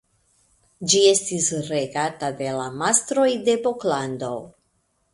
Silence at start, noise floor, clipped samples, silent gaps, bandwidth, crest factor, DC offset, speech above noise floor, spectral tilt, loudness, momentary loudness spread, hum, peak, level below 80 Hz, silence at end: 0.8 s; -69 dBFS; under 0.1%; none; 11.5 kHz; 22 dB; under 0.1%; 47 dB; -3 dB/octave; -21 LUFS; 12 LU; none; -2 dBFS; -64 dBFS; 0.65 s